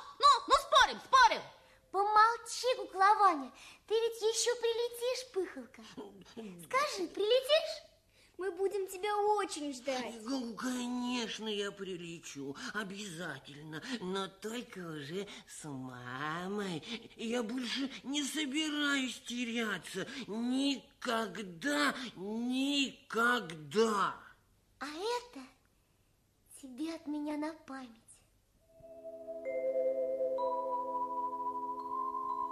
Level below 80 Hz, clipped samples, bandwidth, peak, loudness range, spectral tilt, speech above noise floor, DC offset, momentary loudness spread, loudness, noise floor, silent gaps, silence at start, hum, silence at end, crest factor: -70 dBFS; under 0.1%; 14.5 kHz; -12 dBFS; 11 LU; -3 dB/octave; 36 dB; under 0.1%; 19 LU; -34 LUFS; -72 dBFS; none; 0 s; none; 0 s; 22 dB